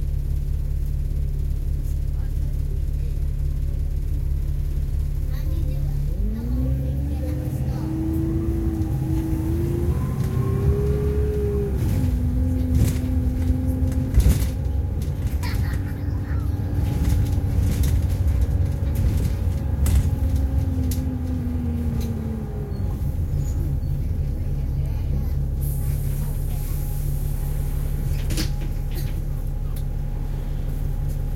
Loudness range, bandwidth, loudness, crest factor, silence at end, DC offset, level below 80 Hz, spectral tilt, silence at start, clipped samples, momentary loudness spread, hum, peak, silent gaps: 5 LU; 16.5 kHz; -25 LUFS; 16 dB; 0 s; under 0.1%; -24 dBFS; -7.5 dB/octave; 0 s; under 0.1%; 6 LU; none; -6 dBFS; none